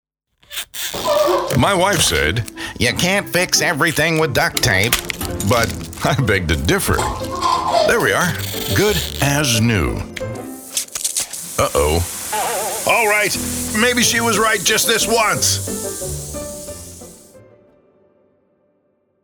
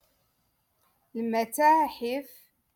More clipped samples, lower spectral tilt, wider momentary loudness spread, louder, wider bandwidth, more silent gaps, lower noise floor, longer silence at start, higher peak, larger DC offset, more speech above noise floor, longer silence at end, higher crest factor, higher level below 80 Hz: neither; about the same, -3 dB/octave vs -3.5 dB/octave; about the same, 12 LU vs 14 LU; first, -17 LUFS vs -26 LUFS; first, over 20 kHz vs 17.5 kHz; neither; second, -63 dBFS vs -73 dBFS; second, 0.5 s vs 1.15 s; first, -2 dBFS vs -12 dBFS; neither; about the same, 47 dB vs 47 dB; first, 1.85 s vs 0.5 s; about the same, 16 dB vs 18 dB; first, -36 dBFS vs -72 dBFS